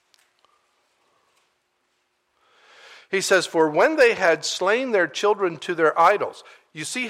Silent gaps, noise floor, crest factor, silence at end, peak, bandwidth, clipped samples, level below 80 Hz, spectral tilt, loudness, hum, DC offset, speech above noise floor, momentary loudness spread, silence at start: none; -71 dBFS; 18 dB; 0 s; -6 dBFS; 15.5 kHz; under 0.1%; -70 dBFS; -3 dB/octave; -20 LUFS; none; under 0.1%; 50 dB; 11 LU; 3.1 s